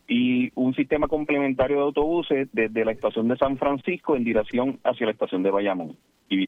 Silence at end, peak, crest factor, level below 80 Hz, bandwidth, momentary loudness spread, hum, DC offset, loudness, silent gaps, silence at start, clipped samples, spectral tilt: 0 s; -8 dBFS; 16 dB; -50 dBFS; 4 kHz; 4 LU; none; under 0.1%; -24 LUFS; none; 0.1 s; under 0.1%; -8 dB/octave